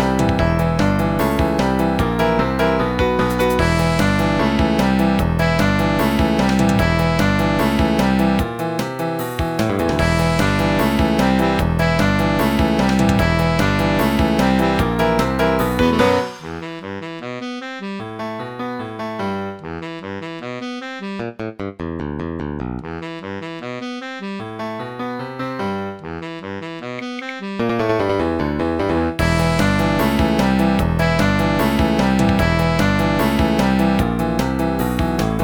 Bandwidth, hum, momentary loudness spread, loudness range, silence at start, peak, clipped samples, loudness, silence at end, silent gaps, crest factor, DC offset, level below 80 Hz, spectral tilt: 19.5 kHz; none; 12 LU; 11 LU; 0 s; -2 dBFS; under 0.1%; -18 LUFS; 0 s; none; 16 dB; under 0.1%; -30 dBFS; -6.5 dB/octave